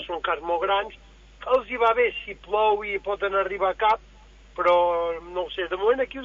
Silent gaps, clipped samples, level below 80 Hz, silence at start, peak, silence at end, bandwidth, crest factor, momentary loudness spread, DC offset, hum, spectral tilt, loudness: none; under 0.1%; -50 dBFS; 0 s; -8 dBFS; 0 s; 7.2 kHz; 16 dB; 9 LU; under 0.1%; none; -5 dB/octave; -24 LUFS